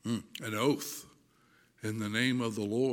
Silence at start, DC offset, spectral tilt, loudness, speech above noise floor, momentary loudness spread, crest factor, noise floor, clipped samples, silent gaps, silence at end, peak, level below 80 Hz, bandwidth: 0.05 s; under 0.1%; -5 dB/octave; -33 LUFS; 35 dB; 11 LU; 18 dB; -66 dBFS; under 0.1%; none; 0 s; -16 dBFS; -76 dBFS; 17.5 kHz